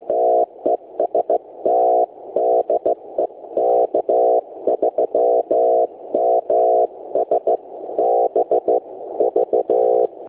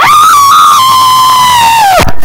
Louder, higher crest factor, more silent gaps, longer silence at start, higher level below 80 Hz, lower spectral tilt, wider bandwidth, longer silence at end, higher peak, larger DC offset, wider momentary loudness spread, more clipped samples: second, -19 LUFS vs -3 LUFS; first, 12 dB vs 4 dB; neither; about the same, 0 s vs 0 s; second, -66 dBFS vs -26 dBFS; first, -10 dB/octave vs -1.5 dB/octave; second, 3.6 kHz vs over 20 kHz; about the same, 0 s vs 0 s; second, -6 dBFS vs 0 dBFS; neither; first, 6 LU vs 2 LU; second, under 0.1% vs 10%